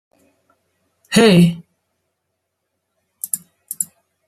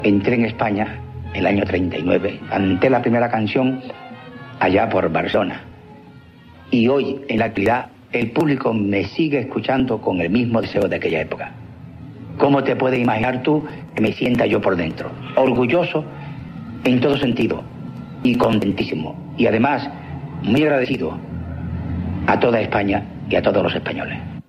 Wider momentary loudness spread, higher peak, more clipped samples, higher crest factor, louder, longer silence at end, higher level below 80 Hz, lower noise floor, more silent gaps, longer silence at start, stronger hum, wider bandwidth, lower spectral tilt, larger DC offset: first, 20 LU vs 14 LU; first, 0 dBFS vs -4 dBFS; neither; about the same, 20 dB vs 16 dB; first, -16 LUFS vs -19 LUFS; first, 0.45 s vs 0.1 s; second, -56 dBFS vs -44 dBFS; first, -75 dBFS vs -43 dBFS; neither; first, 1.1 s vs 0 s; neither; first, 15 kHz vs 12.5 kHz; second, -5 dB/octave vs -8 dB/octave; neither